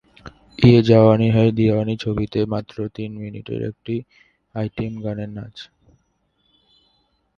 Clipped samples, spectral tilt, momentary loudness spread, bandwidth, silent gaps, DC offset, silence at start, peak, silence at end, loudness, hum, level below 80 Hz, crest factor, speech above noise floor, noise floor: under 0.1%; -9 dB/octave; 19 LU; 6.8 kHz; none; under 0.1%; 0.25 s; 0 dBFS; 1.75 s; -19 LUFS; none; -46 dBFS; 20 dB; 48 dB; -67 dBFS